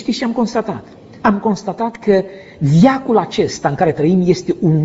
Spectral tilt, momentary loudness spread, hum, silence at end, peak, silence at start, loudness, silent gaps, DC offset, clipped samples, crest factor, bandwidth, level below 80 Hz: -6.5 dB/octave; 10 LU; none; 0 s; 0 dBFS; 0 s; -16 LUFS; none; under 0.1%; under 0.1%; 16 dB; 8 kHz; -48 dBFS